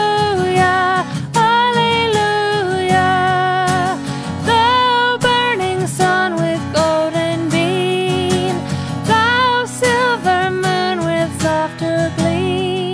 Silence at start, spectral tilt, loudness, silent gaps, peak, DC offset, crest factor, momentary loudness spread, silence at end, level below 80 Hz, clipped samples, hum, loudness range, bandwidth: 0 s; -4.5 dB/octave; -15 LUFS; none; -2 dBFS; under 0.1%; 14 dB; 6 LU; 0 s; -48 dBFS; under 0.1%; none; 2 LU; 11 kHz